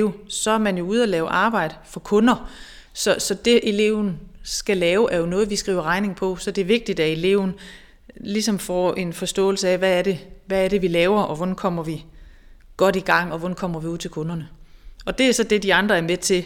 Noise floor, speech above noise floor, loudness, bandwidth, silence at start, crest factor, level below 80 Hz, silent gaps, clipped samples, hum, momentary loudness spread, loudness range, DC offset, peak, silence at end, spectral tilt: -46 dBFS; 25 dB; -21 LUFS; 18 kHz; 0 s; 18 dB; -46 dBFS; none; under 0.1%; none; 11 LU; 2 LU; under 0.1%; -2 dBFS; 0 s; -4.5 dB/octave